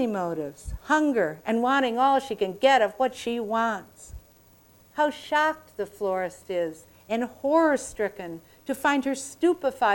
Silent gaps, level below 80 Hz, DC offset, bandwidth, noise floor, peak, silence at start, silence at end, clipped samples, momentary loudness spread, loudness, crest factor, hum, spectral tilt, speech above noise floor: none; -52 dBFS; under 0.1%; 18 kHz; -56 dBFS; -8 dBFS; 0 s; 0 s; under 0.1%; 14 LU; -25 LUFS; 18 dB; none; -4 dB/octave; 31 dB